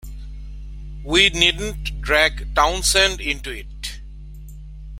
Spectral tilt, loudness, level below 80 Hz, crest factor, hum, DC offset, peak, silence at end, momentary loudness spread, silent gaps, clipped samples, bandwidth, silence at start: -2 dB/octave; -17 LUFS; -32 dBFS; 22 dB; none; under 0.1%; 0 dBFS; 0 s; 23 LU; none; under 0.1%; 16.5 kHz; 0.05 s